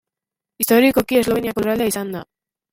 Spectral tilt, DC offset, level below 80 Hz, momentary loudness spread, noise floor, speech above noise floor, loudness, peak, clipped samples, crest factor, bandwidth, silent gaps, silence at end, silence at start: -4 dB/octave; under 0.1%; -50 dBFS; 12 LU; -87 dBFS; 70 dB; -18 LUFS; -2 dBFS; under 0.1%; 18 dB; 16.5 kHz; none; 0.5 s; 0.6 s